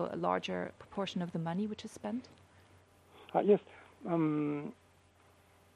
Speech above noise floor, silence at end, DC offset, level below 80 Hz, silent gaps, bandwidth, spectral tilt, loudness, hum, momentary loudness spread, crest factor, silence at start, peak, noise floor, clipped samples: 30 dB; 1.05 s; under 0.1%; -76 dBFS; none; 12 kHz; -7 dB/octave; -35 LUFS; none; 13 LU; 22 dB; 0 s; -16 dBFS; -65 dBFS; under 0.1%